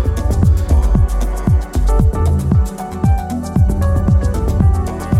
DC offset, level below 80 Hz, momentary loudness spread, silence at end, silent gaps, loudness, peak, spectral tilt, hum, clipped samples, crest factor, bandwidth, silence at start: under 0.1%; -16 dBFS; 5 LU; 0 s; none; -16 LUFS; -2 dBFS; -8 dB/octave; none; under 0.1%; 12 dB; 14 kHz; 0 s